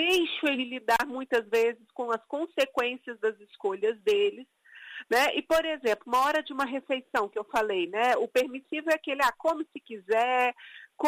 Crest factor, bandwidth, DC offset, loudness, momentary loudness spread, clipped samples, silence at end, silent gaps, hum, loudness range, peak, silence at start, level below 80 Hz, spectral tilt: 16 dB; 15.5 kHz; under 0.1%; -28 LUFS; 8 LU; under 0.1%; 0 s; none; none; 2 LU; -12 dBFS; 0 s; -66 dBFS; -2.5 dB/octave